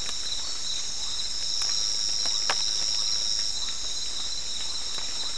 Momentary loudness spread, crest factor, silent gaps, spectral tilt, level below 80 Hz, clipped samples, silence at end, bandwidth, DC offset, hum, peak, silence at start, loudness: 5 LU; 24 dB; none; 1 dB/octave; -52 dBFS; under 0.1%; 0 s; 12 kHz; 3%; none; -6 dBFS; 0 s; -26 LUFS